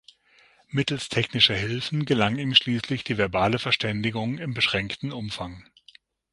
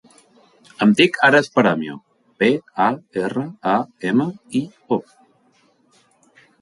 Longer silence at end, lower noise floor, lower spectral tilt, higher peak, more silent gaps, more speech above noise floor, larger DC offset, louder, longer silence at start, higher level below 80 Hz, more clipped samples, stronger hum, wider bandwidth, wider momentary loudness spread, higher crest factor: second, 0.7 s vs 1.6 s; about the same, -59 dBFS vs -59 dBFS; about the same, -5 dB/octave vs -5.5 dB/octave; about the same, -2 dBFS vs -2 dBFS; neither; second, 34 dB vs 41 dB; neither; second, -24 LUFS vs -19 LUFS; about the same, 0.7 s vs 0.8 s; first, -52 dBFS vs -64 dBFS; neither; neither; about the same, 11.5 kHz vs 11.5 kHz; about the same, 12 LU vs 11 LU; about the same, 24 dB vs 20 dB